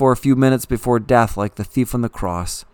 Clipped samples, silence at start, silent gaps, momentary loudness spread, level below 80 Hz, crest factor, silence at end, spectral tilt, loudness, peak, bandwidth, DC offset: under 0.1%; 0 s; none; 9 LU; -36 dBFS; 18 dB; 0.1 s; -6.5 dB/octave; -18 LUFS; 0 dBFS; 19 kHz; under 0.1%